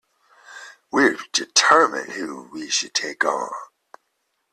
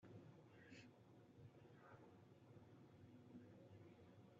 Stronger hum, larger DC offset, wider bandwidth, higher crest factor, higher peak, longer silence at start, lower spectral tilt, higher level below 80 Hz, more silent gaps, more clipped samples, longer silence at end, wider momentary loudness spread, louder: neither; neither; first, 13.5 kHz vs 7.2 kHz; first, 22 dB vs 16 dB; first, 0 dBFS vs -50 dBFS; first, 0.5 s vs 0 s; second, -0.5 dB/octave vs -6.5 dB/octave; first, -68 dBFS vs under -90 dBFS; neither; neither; first, 0.85 s vs 0 s; first, 21 LU vs 4 LU; first, -20 LUFS vs -66 LUFS